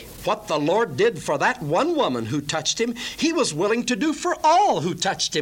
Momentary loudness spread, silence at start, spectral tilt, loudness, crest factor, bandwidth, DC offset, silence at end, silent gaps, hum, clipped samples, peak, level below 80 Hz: 6 LU; 0 s; -3.5 dB/octave; -22 LUFS; 14 dB; 17 kHz; under 0.1%; 0 s; none; none; under 0.1%; -8 dBFS; -54 dBFS